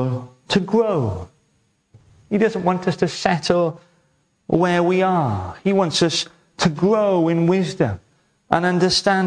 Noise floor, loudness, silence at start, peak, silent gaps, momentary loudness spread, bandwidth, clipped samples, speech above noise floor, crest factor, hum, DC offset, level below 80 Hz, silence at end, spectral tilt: -64 dBFS; -19 LUFS; 0 s; 0 dBFS; none; 7 LU; 10.5 kHz; under 0.1%; 46 dB; 20 dB; none; under 0.1%; -52 dBFS; 0 s; -5.5 dB/octave